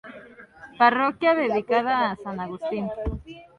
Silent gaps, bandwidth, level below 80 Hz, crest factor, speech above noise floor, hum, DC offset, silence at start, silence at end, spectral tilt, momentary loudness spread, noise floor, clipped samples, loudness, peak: none; 6.8 kHz; -44 dBFS; 20 dB; 23 dB; none; under 0.1%; 0.05 s; 0.15 s; -7 dB/octave; 13 LU; -47 dBFS; under 0.1%; -23 LUFS; -6 dBFS